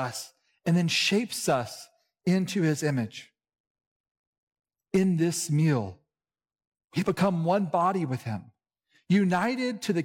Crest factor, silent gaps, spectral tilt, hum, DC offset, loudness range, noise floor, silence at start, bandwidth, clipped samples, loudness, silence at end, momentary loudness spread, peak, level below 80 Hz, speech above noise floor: 14 dB; 3.60-3.75 s, 3.87-4.04 s, 4.11-4.47 s, 6.67-6.72 s, 6.84-6.88 s; -5.5 dB/octave; none; under 0.1%; 3 LU; under -90 dBFS; 0 s; 17 kHz; under 0.1%; -27 LUFS; 0 s; 13 LU; -14 dBFS; -70 dBFS; over 64 dB